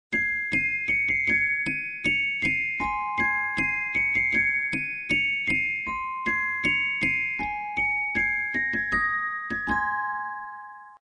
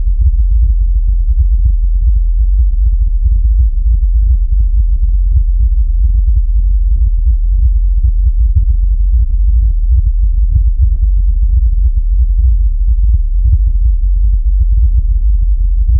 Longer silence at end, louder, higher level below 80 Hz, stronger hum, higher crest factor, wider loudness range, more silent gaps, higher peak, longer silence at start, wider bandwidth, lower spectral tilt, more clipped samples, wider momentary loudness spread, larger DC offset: about the same, 0.05 s vs 0 s; second, -24 LUFS vs -14 LUFS; second, -52 dBFS vs -10 dBFS; neither; first, 14 dB vs 8 dB; about the same, 2 LU vs 0 LU; neither; second, -12 dBFS vs 0 dBFS; about the same, 0.1 s vs 0 s; first, 10.5 kHz vs 0.3 kHz; second, -4 dB/octave vs -17 dB/octave; neither; first, 7 LU vs 2 LU; neither